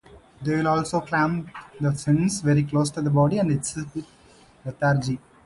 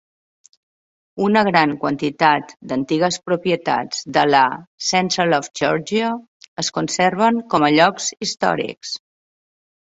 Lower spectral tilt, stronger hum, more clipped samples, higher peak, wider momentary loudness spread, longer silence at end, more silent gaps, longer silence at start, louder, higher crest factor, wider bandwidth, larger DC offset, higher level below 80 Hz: first, -6 dB/octave vs -4 dB/octave; neither; neither; second, -8 dBFS vs -2 dBFS; about the same, 12 LU vs 10 LU; second, 0.3 s vs 0.85 s; second, none vs 4.67-4.78 s, 6.28-6.40 s, 6.48-6.56 s; second, 0.15 s vs 1.15 s; second, -24 LUFS vs -18 LUFS; about the same, 16 dB vs 18 dB; first, 11.5 kHz vs 8 kHz; neither; first, -54 dBFS vs -60 dBFS